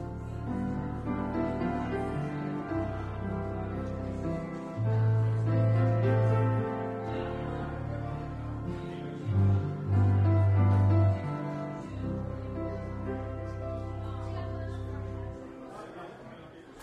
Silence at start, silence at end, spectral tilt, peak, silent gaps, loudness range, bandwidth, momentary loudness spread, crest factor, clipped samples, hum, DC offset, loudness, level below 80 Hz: 0 s; 0 s; -9.5 dB/octave; -14 dBFS; none; 10 LU; 5 kHz; 13 LU; 16 dB; under 0.1%; none; under 0.1%; -31 LUFS; -46 dBFS